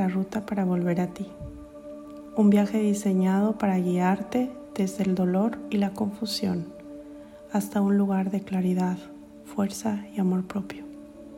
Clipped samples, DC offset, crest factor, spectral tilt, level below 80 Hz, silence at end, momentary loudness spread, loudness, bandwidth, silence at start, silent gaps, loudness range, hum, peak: under 0.1%; under 0.1%; 16 dB; -7 dB/octave; -58 dBFS; 0 s; 19 LU; -26 LUFS; 16 kHz; 0 s; none; 4 LU; none; -10 dBFS